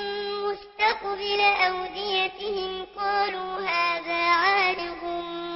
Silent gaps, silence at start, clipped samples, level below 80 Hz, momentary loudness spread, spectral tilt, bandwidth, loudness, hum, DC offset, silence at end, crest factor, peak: none; 0 s; under 0.1%; -58 dBFS; 11 LU; -5.5 dB/octave; 5.8 kHz; -25 LUFS; none; under 0.1%; 0 s; 18 dB; -8 dBFS